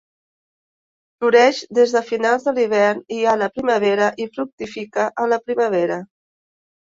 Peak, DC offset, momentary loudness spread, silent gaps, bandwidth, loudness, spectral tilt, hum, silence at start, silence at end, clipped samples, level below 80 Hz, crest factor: -2 dBFS; under 0.1%; 11 LU; 4.52-4.58 s; 7.6 kHz; -18 LUFS; -4.5 dB/octave; none; 1.2 s; 0.8 s; under 0.1%; -66 dBFS; 18 dB